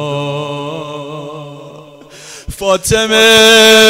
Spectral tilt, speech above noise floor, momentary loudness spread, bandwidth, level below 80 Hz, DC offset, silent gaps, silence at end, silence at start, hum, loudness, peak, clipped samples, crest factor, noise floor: -2.5 dB/octave; 28 dB; 25 LU; 16.5 kHz; -38 dBFS; under 0.1%; none; 0 s; 0 s; none; -8 LUFS; 0 dBFS; under 0.1%; 12 dB; -35 dBFS